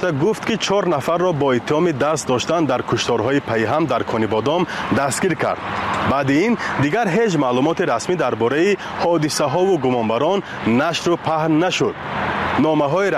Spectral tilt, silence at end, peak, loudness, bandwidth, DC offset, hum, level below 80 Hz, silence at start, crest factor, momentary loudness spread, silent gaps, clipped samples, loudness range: -5 dB/octave; 0 s; -6 dBFS; -18 LUFS; 15 kHz; under 0.1%; none; -50 dBFS; 0 s; 12 dB; 3 LU; none; under 0.1%; 1 LU